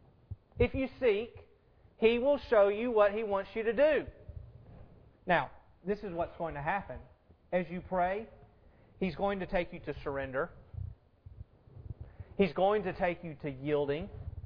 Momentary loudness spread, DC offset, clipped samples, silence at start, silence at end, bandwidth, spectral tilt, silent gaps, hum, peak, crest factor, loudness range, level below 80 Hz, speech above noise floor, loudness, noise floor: 21 LU; under 0.1%; under 0.1%; 0.3 s; 0 s; 5.4 kHz; -5 dB/octave; none; none; -12 dBFS; 20 dB; 8 LU; -52 dBFS; 32 dB; -32 LUFS; -63 dBFS